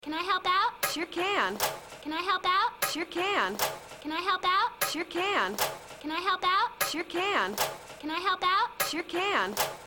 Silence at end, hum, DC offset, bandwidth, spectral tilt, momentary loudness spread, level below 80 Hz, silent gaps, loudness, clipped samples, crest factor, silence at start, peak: 0 s; none; under 0.1%; 17.5 kHz; -1.5 dB/octave; 6 LU; -64 dBFS; none; -29 LUFS; under 0.1%; 18 dB; 0.05 s; -12 dBFS